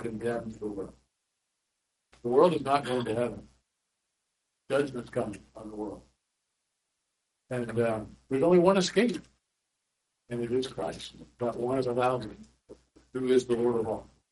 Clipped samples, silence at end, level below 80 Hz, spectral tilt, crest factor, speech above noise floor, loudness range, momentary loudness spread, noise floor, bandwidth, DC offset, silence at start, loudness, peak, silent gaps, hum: under 0.1%; 0.3 s; -62 dBFS; -6 dB/octave; 22 dB; 54 dB; 9 LU; 17 LU; -82 dBFS; 11.5 kHz; under 0.1%; 0 s; -29 LUFS; -8 dBFS; none; none